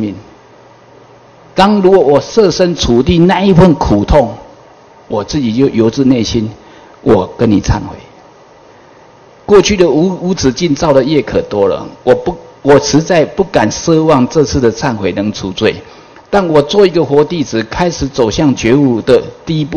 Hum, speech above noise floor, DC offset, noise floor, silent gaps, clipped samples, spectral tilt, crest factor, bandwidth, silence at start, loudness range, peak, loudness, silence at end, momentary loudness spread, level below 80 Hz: none; 30 dB; under 0.1%; -40 dBFS; none; 2%; -6 dB/octave; 10 dB; 11 kHz; 0 s; 4 LU; 0 dBFS; -11 LUFS; 0 s; 9 LU; -30 dBFS